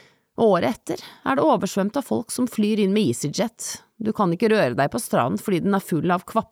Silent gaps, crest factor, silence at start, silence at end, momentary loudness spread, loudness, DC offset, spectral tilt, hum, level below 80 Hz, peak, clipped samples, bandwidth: none; 14 dB; 0.4 s; 0.1 s; 9 LU; -22 LUFS; under 0.1%; -5.5 dB/octave; none; -62 dBFS; -8 dBFS; under 0.1%; 17 kHz